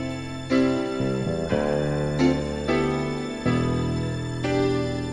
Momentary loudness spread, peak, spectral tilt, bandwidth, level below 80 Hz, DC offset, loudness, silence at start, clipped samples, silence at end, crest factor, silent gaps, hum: 6 LU; -8 dBFS; -6.5 dB/octave; 11 kHz; -42 dBFS; under 0.1%; -25 LUFS; 0 s; under 0.1%; 0 s; 16 dB; none; none